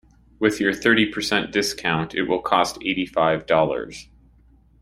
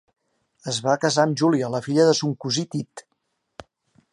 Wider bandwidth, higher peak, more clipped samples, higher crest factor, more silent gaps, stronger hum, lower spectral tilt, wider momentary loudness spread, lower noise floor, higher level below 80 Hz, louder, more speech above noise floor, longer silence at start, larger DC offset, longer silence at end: first, 16 kHz vs 11.5 kHz; about the same, -2 dBFS vs -4 dBFS; neither; about the same, 20 dB vs 20 dB; neither; neither; about the same, -4 dB/octave vs -4.5 dB/octave; second, 6 LU vs 12 LU; second, -54 dBFS vs -74 dBFS; first, -52 dBFS vs -66 dBFS; about the same, -21 LUFS vs -22 LUFS; second, 33 dB vs 53 dB; second, 0.4 s vs 0.65 s; neither; second, 0.8 s vs 1.1 s